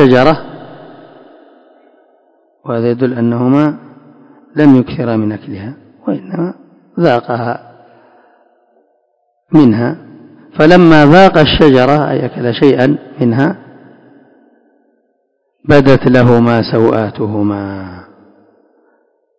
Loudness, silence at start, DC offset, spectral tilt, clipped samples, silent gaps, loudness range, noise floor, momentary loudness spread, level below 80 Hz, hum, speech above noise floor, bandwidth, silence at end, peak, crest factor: -10 LUFS; 0 s; under 0.1%; -8 dB/octave; 2%; none; 10 LU; -63 dBFS; 20 LU; -38 dBFS; none; 53 dB; 8 kHz; 1.35 s; 0 dBFS; 12 dB